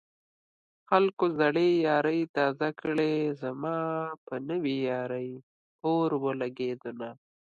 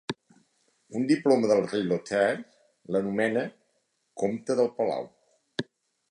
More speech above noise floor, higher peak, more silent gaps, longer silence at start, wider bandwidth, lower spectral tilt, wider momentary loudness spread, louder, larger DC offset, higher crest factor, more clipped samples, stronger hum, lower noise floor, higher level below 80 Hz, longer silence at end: first, over 62 dB vs 48 dB; about the same, -6 dBFS vs -8 dBFS; first, 1.13-1.17 s, 2.29-2.34 s, 4.18-4.27 s, 5.43-5.79 s vs none; first, 0.9 s vs 0.1 s; second, 7.2 kHz vs 10.5 kHz; first, -7.5 dB/octave vs -6 dB/octave; second, 12 LU vs 16 LU; about the same, -29 LUFS vs -28 LUFS; neither; about the same, 22 dB vs 20 dB; neither; neither; first, under -90 dBFS vs -74 dBFS; second, -78 dBFS vs -72 dBFS; about the same, 0.45 s vs 0.5 s